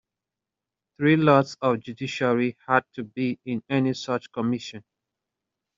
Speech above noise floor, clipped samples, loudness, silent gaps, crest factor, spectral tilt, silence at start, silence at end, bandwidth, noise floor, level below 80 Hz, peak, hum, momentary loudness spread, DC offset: 64 dB; under 0.1%; -24 LUFS; none; 22 dB; -5.5 dB/octave; 1 s; 0.95 s; 7.6 kHz; -88 dBFS; -68 dBFS; -4 dBFS; none; 12 LU; under 0.1%